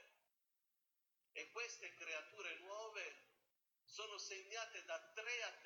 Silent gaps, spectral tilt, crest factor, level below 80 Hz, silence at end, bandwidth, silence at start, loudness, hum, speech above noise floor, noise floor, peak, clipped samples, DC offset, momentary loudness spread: none; 1 dB/octave; 20 dB; under -90 dBFS; 0 s; 19 kHz; 0 s; -50 LUFS; none; 37 dB; -89 dBFS; -34 dBFS; under 0.1%; under 0.1%; 7 LU